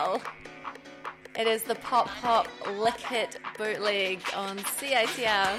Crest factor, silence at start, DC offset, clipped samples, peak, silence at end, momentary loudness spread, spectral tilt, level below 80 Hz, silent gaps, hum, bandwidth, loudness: 18 dB; 0 s; under 0.1%; under 0.1%; -12 dBFS; 0 s; 16 LU; -2 dB/octave; -64 dBFS; none; none; 16 kHz; -28 LUFS